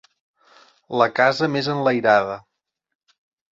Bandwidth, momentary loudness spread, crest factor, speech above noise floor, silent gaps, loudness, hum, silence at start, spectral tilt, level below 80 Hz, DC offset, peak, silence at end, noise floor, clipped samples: 7.8 kHz; 12 LU; 20 dB; 35 dB; none; -19 LUFS; none; 0.9 s; -6 dB/octave; -66 dBFS; under 0.1%; -2 dBFS; 1.2 s; -54 dBFS; under 0.1%